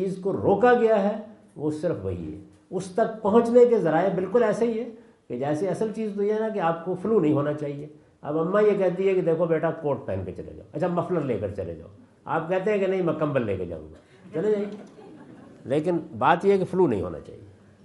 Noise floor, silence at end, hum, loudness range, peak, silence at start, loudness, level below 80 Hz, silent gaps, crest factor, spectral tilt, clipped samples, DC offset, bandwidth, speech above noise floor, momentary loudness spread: -47 dBFS; 0.35 s; none; 5 LU; -4 dBFS; 0 s; -24 LUFS; -62 dBFS; none; 20 dB; -8 dB/octave; under 0.1%; under 0.1%; 11.5 kHz; 23 dB; 17 LU